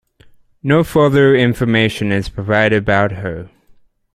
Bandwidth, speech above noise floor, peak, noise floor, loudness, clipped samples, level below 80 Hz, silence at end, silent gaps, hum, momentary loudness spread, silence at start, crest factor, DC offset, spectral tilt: 15.5 kHz; 35 dB; 0 dBFS; -49 dBFS; -14 LUFS; under 0.1%; -40 dBFS; 0.65 s; none; none; 14 LU; 0.65 s; 16 dB; under 0.1%; -7 dB/octave